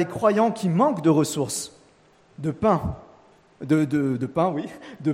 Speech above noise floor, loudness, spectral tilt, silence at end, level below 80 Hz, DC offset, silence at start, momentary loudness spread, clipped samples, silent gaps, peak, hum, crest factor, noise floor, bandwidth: 34 dB; -23 LUFS; -6 dB/octave; 0 s; -52 dBFS; under 0.1%; 0 s; 13 LU; under 0.1%; none; -6 dBFS; none; 18 dB; -57 dBFS; 16 kHz